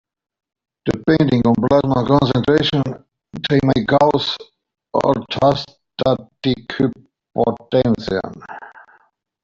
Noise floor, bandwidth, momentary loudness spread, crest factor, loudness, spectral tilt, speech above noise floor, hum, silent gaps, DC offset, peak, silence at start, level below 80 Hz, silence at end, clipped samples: -57 dBFS; 7.6 kHz; 14 LU; 16 dB; -18 LUFS; -7.5 dB/octave; 40 dB; none; none; under 0.1%; -2 dBFS; 0.85 s; -46 dBFS; 0.75 s; under 0.1%